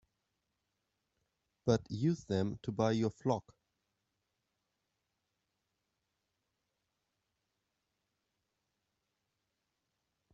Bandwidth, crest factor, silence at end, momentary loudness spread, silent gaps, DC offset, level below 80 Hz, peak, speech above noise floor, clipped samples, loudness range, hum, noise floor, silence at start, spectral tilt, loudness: 8 kHz; 26 dB; 6.95 s; 6 LU; none; under 0.1%; -70 dBFS; -16 dBFS; 52 dB; under 0.1%; 7 LU; none; -86 dBFS; 1.65 s; -7 dB/octave; -35 LUFS